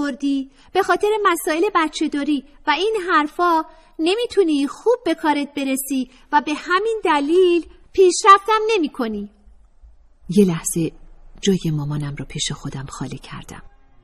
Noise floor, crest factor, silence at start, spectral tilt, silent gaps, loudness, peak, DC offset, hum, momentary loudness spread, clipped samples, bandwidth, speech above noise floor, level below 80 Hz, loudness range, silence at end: -47 dBFS; 20 dB; 0 s; -4.5 dB/octave; none; -19 LUFS; 0 dBFS; under 0.1%; none; 12 LU; under 0.1%; 15 kHz; 28 dB; -46 dBFS; 6 LU; 0.35 s